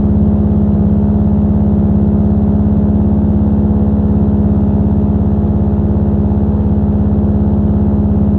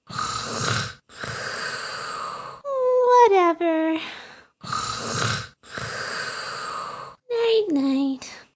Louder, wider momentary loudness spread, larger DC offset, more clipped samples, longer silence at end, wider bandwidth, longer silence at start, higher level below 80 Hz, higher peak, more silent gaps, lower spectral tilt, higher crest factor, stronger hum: first, -12 LUFS vs -24 LUFS; second, 1 LU vs 17 LU; neither; neither; second, 0 s vs 0.15 s; second, 2.1 kHz vs 8 kHz; about the same, 0 s vs 0.1 s; first, -18 dBFS vs -56 dBFS; first, 0 dBFS vs -4 dBFS; neither; first, -13 dB/octave vs -4 dB/octave; second, 10 dB vs 20 dB; neither